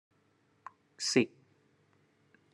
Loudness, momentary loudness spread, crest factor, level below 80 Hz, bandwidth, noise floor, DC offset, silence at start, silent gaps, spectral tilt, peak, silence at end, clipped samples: -32 LUFS; 25 LU; 26 dB; -86 dBFS; 12.5 kHz; -71 dBFS; under 0.1%; 1 s; none; -3.5 dB/octave; -12 dBFS; 1.25 s; under 0.1%